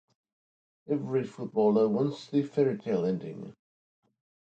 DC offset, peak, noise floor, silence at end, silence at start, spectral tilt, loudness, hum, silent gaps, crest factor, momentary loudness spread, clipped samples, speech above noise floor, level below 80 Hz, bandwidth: under 0.1%; -12 dBFS; under -90 dBFS; 1 s; 0.9 s; -8.5 dB/octave; -29 LUFS; none; none; 18 dB; 12 LU; under 0.1%; over 62 dB; -74 dBFS; 8 kHz